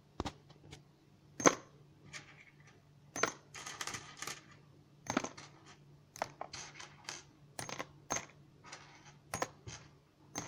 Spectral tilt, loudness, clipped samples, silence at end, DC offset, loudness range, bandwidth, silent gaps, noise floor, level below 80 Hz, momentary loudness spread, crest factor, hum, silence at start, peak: -2.5 dB/octave; -40 LUFS; under 0.1%; 0 s; under 0.1%; 7 LU; 18 kHz; none; -64 dBFS; -68 dBFS; 22 LU; 38 dB; none; 0.2 s; -6 dBFS